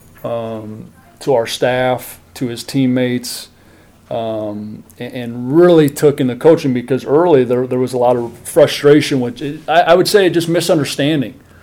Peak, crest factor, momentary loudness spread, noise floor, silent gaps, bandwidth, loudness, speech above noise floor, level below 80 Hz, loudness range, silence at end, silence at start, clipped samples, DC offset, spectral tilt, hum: 0 dBFS; 14 dB; 16 LU; -45 dBFS; none; 17 kHz; -14 LUFS; 31 dB; -52 dBFS; 7 LU; 0.3 s; 0.25 s; under 0.1%; under 0.1%; -5.5 dB/octave; none